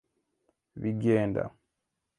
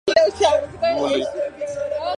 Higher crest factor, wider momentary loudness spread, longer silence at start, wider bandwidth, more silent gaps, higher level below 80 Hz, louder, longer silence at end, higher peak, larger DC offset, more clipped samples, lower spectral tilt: about the same, 20 dB vs 18 dB; first, 14 LU vs 10 LU; first, 0.75 s vs 0.05 s; about the same, 10 kHz vs 10.5 kHz; neither; second, -60 dBFS vs -48 dBFS; second, -29 LUFS vs -21 LUFS; first, 0.7 s vs 0.05 s; second, -12 dBFS vs -2 dBFS; neither; neither; first, -9 dB/octave vs -3.5 dB/octave